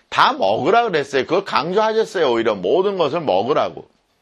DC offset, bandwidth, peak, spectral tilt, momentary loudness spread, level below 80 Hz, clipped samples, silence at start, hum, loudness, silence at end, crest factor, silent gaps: under 0.1%; 11.5 kHz; 0 dBFS; -5 dB/octave; 4 LU; -62 dBFS; under 0.1%; 0.1 s; none; -18 LUFS; 0.4 s; 18 dB; none